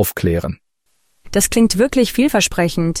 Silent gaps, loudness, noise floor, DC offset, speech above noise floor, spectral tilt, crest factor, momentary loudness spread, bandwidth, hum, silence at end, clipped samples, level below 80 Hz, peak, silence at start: none; -16 LUFS; -66 dBFS; under 0.1%; 50 dB; -4.5 dB/octave; 14 dB; 8 LU; 16.5 kHz; none; 0 s; under 0.1%; -36 dBFS; -4 dBFS; 0 s